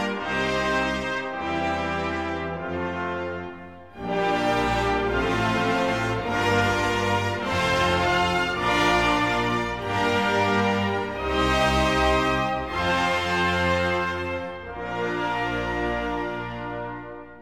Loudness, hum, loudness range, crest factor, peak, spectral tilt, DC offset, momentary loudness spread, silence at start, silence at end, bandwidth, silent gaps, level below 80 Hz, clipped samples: -24 LUFS; none; 5 LU; 16 dB; -8 dBFS; -5 dB/octave; 0.2%; 11 LU; 0 s; 0 s; 17.5 kHz; none; -40 dBFS; under 0.1%